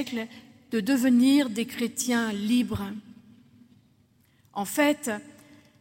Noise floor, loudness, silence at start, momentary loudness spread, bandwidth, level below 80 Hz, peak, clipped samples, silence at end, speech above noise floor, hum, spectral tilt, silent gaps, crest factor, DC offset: -63 dBFS; -26 LUFS; 0 s; 16 LU; 16.5 kHz; -64 dBFS; -12 dBFS; under 0.1%; 0.5 s; 38 dB; none; -4 dB/octave; none; 16 dB; under 0.1%